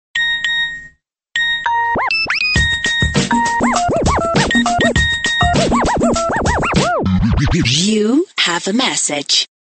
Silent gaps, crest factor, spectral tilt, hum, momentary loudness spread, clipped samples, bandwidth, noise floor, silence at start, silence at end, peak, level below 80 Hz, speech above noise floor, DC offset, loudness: none; 14 dB; -3.5 dB/octave; none; 3 LU; under 0.1%; 9 kHz; -46 dBFS; 0.15 s; 0.3 s; 0 dBFS; -28 dBFS; 31 dB; under 0.1%; -14 LUFS